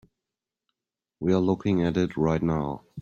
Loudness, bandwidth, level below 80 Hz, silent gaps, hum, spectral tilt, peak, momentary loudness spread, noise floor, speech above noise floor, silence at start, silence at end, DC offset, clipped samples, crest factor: -26 LUFS; 7.2 kHz; -52 dBFS; none; none; -8 dB/octave; -10 dBFS; 6 LU; -89 dBFS; 64 dB; 1.2 s; 0 s; under 0.1%; under 0.1%; 16 dB